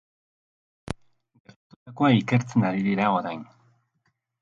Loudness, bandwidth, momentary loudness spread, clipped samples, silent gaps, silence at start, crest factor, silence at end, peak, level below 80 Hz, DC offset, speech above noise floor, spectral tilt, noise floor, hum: -23 LUFS; 10.5 kHz; 17 LU; under 0.1%; 1.40-1.45 s, 1.56-1.70 s, 1.76-1.86 s; 0.85 s; 20 dB; 1 s; -6 dBFS; -58 dBFS; under 0.1%; 51 dB; -7 dB/octave; -73 dBFS; none